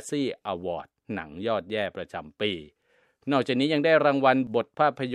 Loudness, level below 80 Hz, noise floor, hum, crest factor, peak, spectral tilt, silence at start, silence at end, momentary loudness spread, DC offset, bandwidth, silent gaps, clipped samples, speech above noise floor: -26 LUFS; -66 dBFS; -66 dBFS; none; 22 dB; -6 dBFS; -5.5 dB/octave; 0 s; 0 s; 16 LU; under 0.1%; 12 kHz; none; under 0.1%; 40 dB